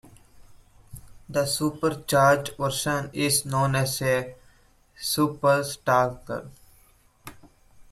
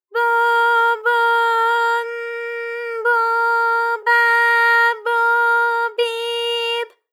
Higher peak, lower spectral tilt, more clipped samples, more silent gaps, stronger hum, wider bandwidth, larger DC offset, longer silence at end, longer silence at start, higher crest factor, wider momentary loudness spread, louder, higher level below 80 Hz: second, -8 dBFS vs -4 dBFS; first, -4 dB/octave vs 3.5 dB/octave; neither; neither; neither; about the same, 16 kHz vs 16.5 kHz; neither; second, 0.1 s vs 0.25 s; first, 0.4 s vs 0.15 s; first, 18 dB vs 12 dB; first, 14 LU vs 11 LU; second, -24 LUFS vs -17 LUFS; first, -54 dBFS vs under -90 dBFS